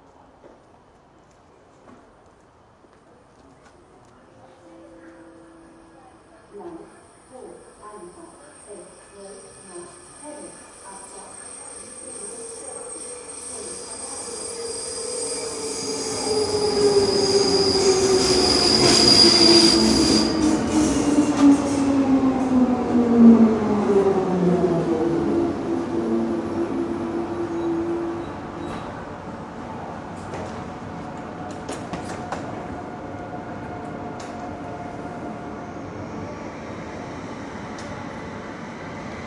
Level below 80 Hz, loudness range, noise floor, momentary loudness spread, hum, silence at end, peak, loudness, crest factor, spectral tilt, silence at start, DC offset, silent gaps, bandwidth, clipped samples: -48 dBFS; 24 LU; -53 dBFS; 23 LU; none; 0 s; -2 dBFS; -19 LUFS; 22 dB; -4 dB/octave; 0.45 s; under 0.1%; none; 11.5 kHz; under 0.1%